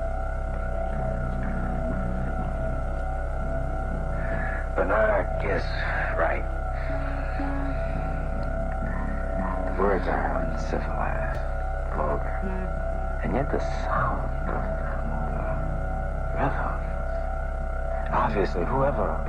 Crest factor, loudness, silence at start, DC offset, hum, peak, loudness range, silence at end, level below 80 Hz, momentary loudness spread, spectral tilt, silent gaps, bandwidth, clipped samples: 16 dB; -29 LUFS; 0 s; under 0.1%; none; -10 dBFS; 3 LU; 0 s; -28 dBFS; 6 LU; -8 dB/octave; none; 6.6 kHz; under 0.1%